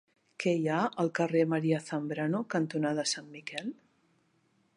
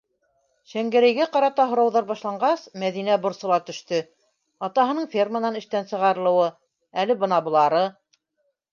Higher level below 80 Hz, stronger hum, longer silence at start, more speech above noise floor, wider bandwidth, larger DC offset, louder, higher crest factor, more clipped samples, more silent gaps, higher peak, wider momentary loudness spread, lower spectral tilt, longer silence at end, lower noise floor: about the same, -82 dBFS vs -78 dBFS; neither; second, 0.4 s vs 0.75 s; second, 41 dB vs 52 dB; first, 11 kHz vs 7.2 kHz; neither; second, -31 LUFS vs -22 LUFS; about the same, 18 dB vs 16 dB; neither; neither; second, -14 dBFS vs -6 dBFS; about the same, 10 LU vs 9 LU; about the same, -5 dB/octave vs -5.5 dB/octave; first, 1.05 s vs 0.8 s; about the same, -71 dBFS vs -74 dBFS